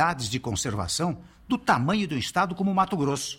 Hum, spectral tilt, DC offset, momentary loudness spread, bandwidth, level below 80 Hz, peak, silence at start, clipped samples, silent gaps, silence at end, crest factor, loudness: none; -4.5 dB/octave; under 0.1%; 6 LU; 16.5 kHz; -54 dBFS; -8 dBFS; 0 s; under 0.1%; none; 0 s; 18 dB; -26 LUFS